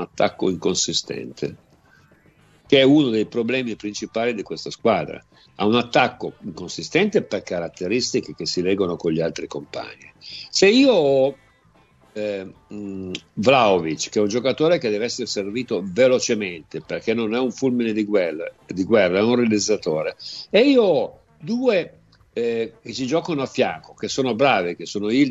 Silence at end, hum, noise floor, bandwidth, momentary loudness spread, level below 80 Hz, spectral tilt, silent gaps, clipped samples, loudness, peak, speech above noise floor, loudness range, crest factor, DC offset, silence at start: 0 s; none; -56 dBFS; 8.2 kHz; 16 LU; -60 dBFS; -4.5 dB/octave; none; under 0.1%; -21 LUFS; -2 dBFS; 36 dB; 3 LU; 18 dB; under 0.1%; 0 s